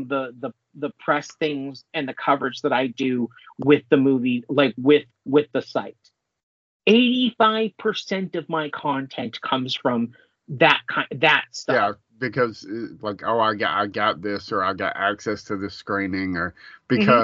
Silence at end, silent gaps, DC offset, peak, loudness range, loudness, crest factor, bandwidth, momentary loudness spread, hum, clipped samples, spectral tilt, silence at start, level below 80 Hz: 0 s; 6.43-6.80 s; under 0.1%; 0 dBFS; 4 LU; -22 LUFS; 22 dB; 7.6 kHz; 13 LU; none; under 0.1%; -3 dB/octave; 0 s; -68 dBFS